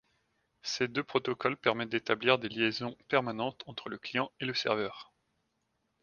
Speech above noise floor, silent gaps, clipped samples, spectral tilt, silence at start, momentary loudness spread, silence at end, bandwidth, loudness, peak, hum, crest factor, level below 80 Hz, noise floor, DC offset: 47 dB; none; under 0.1%; -4.5 dB/octave; 0.65 s; 11 LU; 1 s; 7.2 kHz; -32 LUFS; -8 dBFS; none; 26 dB; -72 dBFS; -79 dBFS; under 0.1%